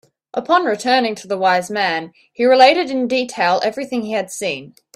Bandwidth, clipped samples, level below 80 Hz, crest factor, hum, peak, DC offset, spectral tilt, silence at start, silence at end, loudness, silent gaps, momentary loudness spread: 14 kHz; under 0.1%; -66 dBFS; 18 dB; none; 0 dBFS; under 0.1%; -3.5 dB/octave; 0.35 s; 0.3 s; -17 LUFS; none; 13 LU